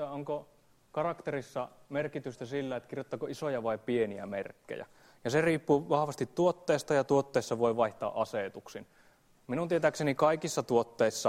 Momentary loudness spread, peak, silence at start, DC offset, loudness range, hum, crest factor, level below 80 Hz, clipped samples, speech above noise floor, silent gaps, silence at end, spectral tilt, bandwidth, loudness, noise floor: 12 LU; -12 dBFS; 0 s; under 0.1%; 7 LU; none; 20 dB; -68 dBFS; under 0.1%; 32 dB; none; 0 s; -5.5 dB/octave; 16 kHz; -32 LUFS; -64 dBFS